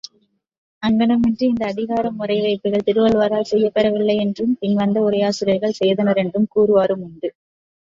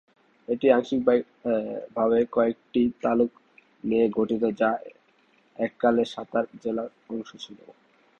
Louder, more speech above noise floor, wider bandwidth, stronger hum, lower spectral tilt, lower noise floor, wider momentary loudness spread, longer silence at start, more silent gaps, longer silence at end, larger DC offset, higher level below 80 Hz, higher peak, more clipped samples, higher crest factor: first, -18 LUFS vs -26 LUFS; first, 46 dB vs 38 dB; about the same, 7.6 kHz vs 7.6 kHz; neither; about the same, -6.5 dB/octave vs -7 dB/octave; about the same, -63 dBFS vs -63 dBFS; second, 6 LU vs 14 LU; first, 0.8 s vs 0.5 s; neither; first, 0.65 s vs 0.5 s; neither; first, -54 dBFS vs -62 dBFS; about the same, -4 dBFS vs -4 dBFS; neither; second, 14 dB vs 22 dB